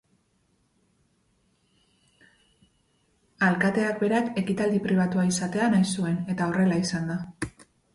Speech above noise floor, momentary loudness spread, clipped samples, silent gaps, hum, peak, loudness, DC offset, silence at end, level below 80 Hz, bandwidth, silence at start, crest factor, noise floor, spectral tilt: 44 dB; 9 LU; under 0.1%; none; none; -10 dBFS; -25 LUFS; under 0.1%; 0.45 s; -60 dBFS; 11.5 kHz; 3.4 s; 16 dB; -69 dBFS; -6 dB/octave